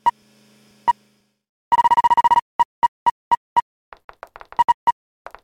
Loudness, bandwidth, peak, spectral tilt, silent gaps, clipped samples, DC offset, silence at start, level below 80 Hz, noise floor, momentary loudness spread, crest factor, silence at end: -19 LUFS; 16 kHz; -6 dBFS; -2.5 dB/octave; 1.49-1.71 s, 2.42-2.59 s, 2.65-2.82 s, 2.88-3.31 s, 3.37-3.56 s, 3.62-3.92 s, 4.04-4.09 s, 4.74-4.87 s; under 0.1%; under 0.1%; 0.05 s; -54 dBFS; -62 dBFS; 8 LU; 14 dB; 0.55 s